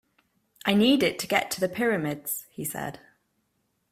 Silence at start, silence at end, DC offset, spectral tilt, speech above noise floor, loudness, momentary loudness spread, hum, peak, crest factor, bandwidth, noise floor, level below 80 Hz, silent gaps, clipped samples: 0.65 s; 0.95 s; under 0.1%; -4 dB/octave; 49 dB; -26 LUFS; 12 LU; none; -6 dBFS; 22 dB; 16 kHz; -74 dBFS; -64 dBFS; none; under 0.1%